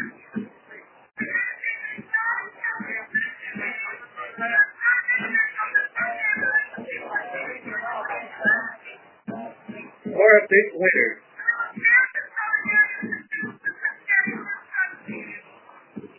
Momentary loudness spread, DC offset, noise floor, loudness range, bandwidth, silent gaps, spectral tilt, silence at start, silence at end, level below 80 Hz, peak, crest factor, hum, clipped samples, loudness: 19 LU; under 0.1%; -50 dBFS; 8 LU; 3.2 kHz; none; -3 dB/octave; 0 s; 0.15 s; -76 dBFS; -2 dBFS; 22 dB; none; under 0.1%; -22 LUFS